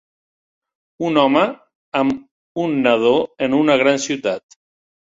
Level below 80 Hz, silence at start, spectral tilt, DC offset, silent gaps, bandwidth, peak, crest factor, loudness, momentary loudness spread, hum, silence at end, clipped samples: -60 dBFS; 1 s; -4.5 dB/octave; under 0.1%; 1.75-1.92 s, 2.31-2.55 s; 8 kHz; -2 dBFS; 18 dB; -18 LUFS; 11 LU; none; 0.7 s; under 0.1%